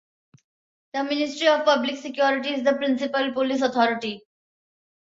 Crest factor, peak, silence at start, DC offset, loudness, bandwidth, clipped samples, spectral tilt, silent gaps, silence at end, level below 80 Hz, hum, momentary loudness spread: 20 dB; -6 dBFS; 0.95 s; under 0.1%; -23 LUFS; 7.8 kHz; under 0.1%; -3.5 dB/octave; none; 0.95 s; -72 dBFS; none; 10 LU